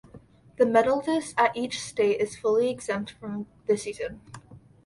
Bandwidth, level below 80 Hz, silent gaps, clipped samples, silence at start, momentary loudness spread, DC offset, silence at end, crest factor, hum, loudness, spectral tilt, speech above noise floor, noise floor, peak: 11.5 kHz; -60 dBFS; none; under 0.1%; 0.15 s; 14 LU; under 0.1%; 0.3 s; 18 dB; none; -26 LUFS; -4.5 dB/octave; 26 dB; -52 dBFS; -8 dBFS